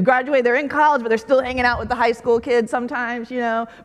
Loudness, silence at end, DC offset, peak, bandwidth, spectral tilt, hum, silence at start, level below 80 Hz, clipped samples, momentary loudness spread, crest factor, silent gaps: -19 LUFS; 0 s; under 0.1%; -2 dBFS; 11.5 kHz; -5.5 dB/octave; none; 0 s; -46 dBFS; under 0.1%; 7 LU; 16 dB; none